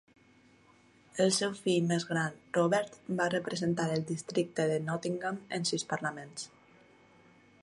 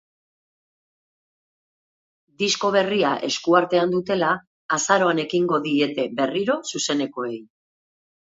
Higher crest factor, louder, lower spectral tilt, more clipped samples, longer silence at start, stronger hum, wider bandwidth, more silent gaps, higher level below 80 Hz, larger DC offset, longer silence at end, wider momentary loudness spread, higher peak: about the same, 20 dB vs 22 dB; second, -32 LUFS vs -22 LUFS; about the same, -4.5 dB/octave vs -3.5 dB/octave; neither; second, 1.15 s vs 2.4 s; neither; first, 11.5 kHz vs 8 kHz; second, none vs 4.47-4.69 s; second, -74 dBFS vs -68 dBFS; neither; first, 1.15 s vs 0.85 s; about the same, 9 LU vs 7 LU; second, -14 dBFS vs -2 dBFS